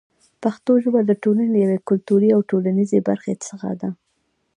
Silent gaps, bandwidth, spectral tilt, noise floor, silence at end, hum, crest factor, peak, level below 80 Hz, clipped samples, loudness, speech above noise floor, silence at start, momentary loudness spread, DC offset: none; 10 kHz; -8 dB/octave; -69 dBFS; 0.65 s; none; 16 dB; -4 dBFS; -68 dBFS; under 0.1%; -19 LUFS; 51 dB; 0.4 s; 11 LU; under 0.1%